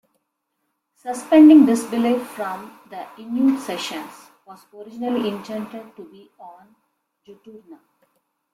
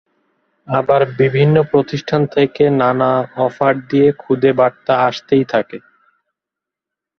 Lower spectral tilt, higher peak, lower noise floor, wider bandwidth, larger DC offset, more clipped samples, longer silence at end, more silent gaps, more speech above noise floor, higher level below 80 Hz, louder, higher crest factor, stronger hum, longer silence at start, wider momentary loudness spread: second, -5 dB/octave vs -8 dB/octave; about the same, -2 dBFS vs 0 dBFS; second, -75 dBFS vs -84 dBFS; first, 14 kHz vs 6.4 kHz; neither; neither; second, 0.8 s vs 1.4 s; neither; second, 56 dB vs 70 dB; second, -66 dBFS vs -54 dBFS; second, -18 LUFS vs -15 LUFS; about the same, 18 dB vs 14 dB; neither; first, 1.05 s vs 0.7 s; first, 26 LU vs 6 LU